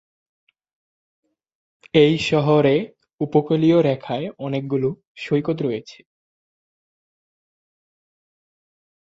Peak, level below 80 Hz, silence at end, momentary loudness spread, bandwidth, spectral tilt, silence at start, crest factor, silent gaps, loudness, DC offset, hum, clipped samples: -2 dBFS; -60 dBFS; 3.1 s; 11 LU; 8 kHz; -7 dB/octave; 1.95 s; 22 dB; 3.13-3.18 s, 5.07-5.15 s; -20 LUFS; under 0.1%; none; under 0.1%